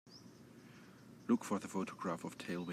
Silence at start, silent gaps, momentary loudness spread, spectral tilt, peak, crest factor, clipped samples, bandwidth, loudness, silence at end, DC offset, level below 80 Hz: 0.05 s; none; 22 LU; -5.5 dB/octave; -22 dBFS; 20 dB; under 0.1%; 15 kHz; -40 LUFS; 0 s; under 0.1%; -84 dBFS